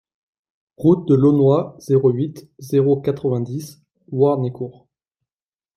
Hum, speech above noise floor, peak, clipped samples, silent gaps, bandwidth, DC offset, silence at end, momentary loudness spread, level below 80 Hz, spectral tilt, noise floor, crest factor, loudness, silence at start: none; over 72 dB; -2 dBFS; under 0.1%; none; 14.5 kHz; under 0.1%; 1.05 s; 16 LU; -60 dBFS; -9.5 dB/octave; under -90 dBFS; 16 dB; -18 LUFS; 0.8 s